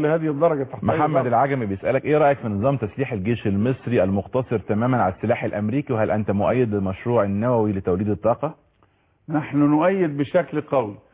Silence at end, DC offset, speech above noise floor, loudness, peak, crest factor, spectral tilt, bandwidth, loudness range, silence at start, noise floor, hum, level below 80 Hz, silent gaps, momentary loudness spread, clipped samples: 0.15 s; under 0.1%; 40 dB; -22 LUFS; -8 dBFS; 14 dB; -12 dB/octave; 4 kHz; 2 LU; 0 s; -61 dBFS; none; -48 dBFS; none; 6 LU; under 0.1%